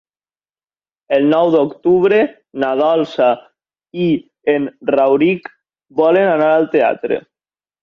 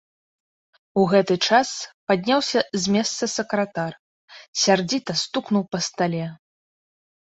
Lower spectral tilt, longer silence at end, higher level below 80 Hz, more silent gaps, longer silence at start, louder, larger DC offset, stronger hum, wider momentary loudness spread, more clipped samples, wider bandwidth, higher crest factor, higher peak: first, -8 dB/octave vs -4 dB/octave; second, 0.6 s vs 0.9 s; about the same, -60 dBFS vs -64 dBFS; second, none vs 1.94-2.07 s, 3.99-4.28 s, 4.48-4.53 s; first, 1.1 s vs 0.95 s; first, -15 LUFS vs -22 LUFS; neither; neither; about the same, 9 LU vs 11 LU; neither; second, 6.6 kHz vs 8.2 kHz; second, 14 dB vs 20 dB; about the same, -2 dBFS vs -4 dBFS